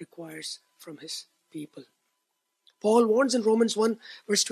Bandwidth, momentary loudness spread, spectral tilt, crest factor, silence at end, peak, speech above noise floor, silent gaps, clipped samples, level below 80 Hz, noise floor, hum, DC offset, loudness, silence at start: 14 kHz; 21 LU; -3 dB/octave; 18 dB; 0 s; -10 dBFS; 53 dB; none; under 0.1%; -84 dBFS; -79 dBFS; none; under 0.1%; -25 LUFS; 0 s